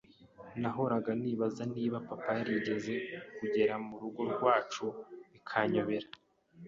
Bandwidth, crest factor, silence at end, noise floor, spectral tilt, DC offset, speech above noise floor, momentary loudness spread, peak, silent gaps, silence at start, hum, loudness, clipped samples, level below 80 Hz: 7.6 kHz; 20 dB; 0 s; -55 dBFS; -6.5 dB/octave; under 0.1%; 21 dB; 12 LU; -14 dBFS; none; 0.2 s; none; -34 LUFS; under 0.1%; -72 dBFS